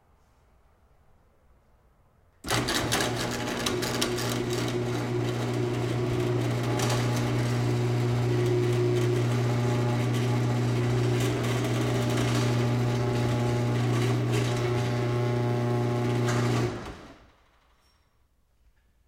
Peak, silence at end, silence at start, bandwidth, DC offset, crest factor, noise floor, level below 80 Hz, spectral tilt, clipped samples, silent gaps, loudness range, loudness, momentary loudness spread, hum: -10 dBFS; 1.9 s; 2.45 s; 16 kHz; under 0.1%; 18 dB; -66 dBFS; -50 dBFS; -5.5 dB/octave; under 0.1%; none; 4 LU; -27 LUFS; 3 LU; none